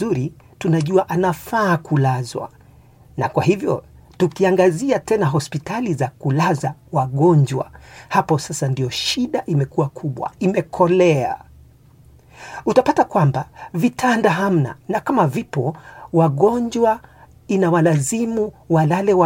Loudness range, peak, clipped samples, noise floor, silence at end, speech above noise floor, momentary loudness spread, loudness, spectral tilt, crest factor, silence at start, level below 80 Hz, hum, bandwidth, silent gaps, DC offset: 2 LU; 0 dBFS; under 0.1%; -48 dBFS; 0 s; 30 dB; 11 LU; -19 LUFS; -6.5 dB/octave; 18 dB; 0 s; -52 dBFS; none; 17 kHz; none; under 0.1%